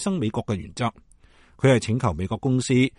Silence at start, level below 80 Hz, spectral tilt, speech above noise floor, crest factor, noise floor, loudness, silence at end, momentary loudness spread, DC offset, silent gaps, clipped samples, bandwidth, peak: 0 s; -48 dBFS; -6 dB/octave; 31 dB; 18 dB; -54 dBFS; -24 LUFS; 0.1 s; 9 LU; under 0.1%; none; under 0.1%; 11 kHz; -4 dBFS